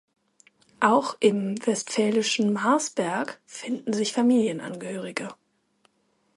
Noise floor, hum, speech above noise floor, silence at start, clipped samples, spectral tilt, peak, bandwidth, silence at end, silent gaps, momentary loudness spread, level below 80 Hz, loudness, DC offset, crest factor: -69 dBFS; none; 45 dB; 0.8 s; under 0.1%; -4 dB/octave; -6 dBFS; 11.5 kHz; 1.05 s; none; 12 LU; -74 dBFS; -25 LUFS; under 0.1%; 20 dB